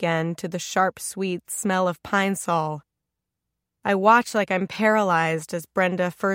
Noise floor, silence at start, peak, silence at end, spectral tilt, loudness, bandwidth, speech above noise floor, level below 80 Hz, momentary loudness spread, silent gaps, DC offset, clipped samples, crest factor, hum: -83 dBFS; 0 s; -4 dBFS; 0 s; -4.5 dB/octave; -23 LUFS; 16.5 kHz; 60 dB; -66 dBFS; 10 LU; none; under 0.1%; under 0.1%; 20 dB; none